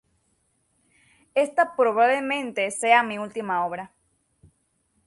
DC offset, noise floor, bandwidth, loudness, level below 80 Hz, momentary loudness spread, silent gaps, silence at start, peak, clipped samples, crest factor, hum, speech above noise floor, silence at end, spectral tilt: under 0.1%; -70 dBFS; 11.5 kHz; -23 LUFS; -72 dBFS; 11 LU; none; 1.35 s; -4 dBFS; under 0.1%; 20 dB; none; 47 dB; 1.2 s; -3 dB/octave